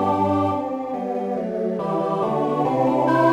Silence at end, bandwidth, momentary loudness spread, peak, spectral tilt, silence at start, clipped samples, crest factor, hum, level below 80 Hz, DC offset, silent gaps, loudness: 0 s; 13 kHz; 7 LU; -6 dBFS; -8 dB/octave; 0 s; under 0.1%; 14 dB; none; -64 dBFS; under 0.1%; none; -22 LUFS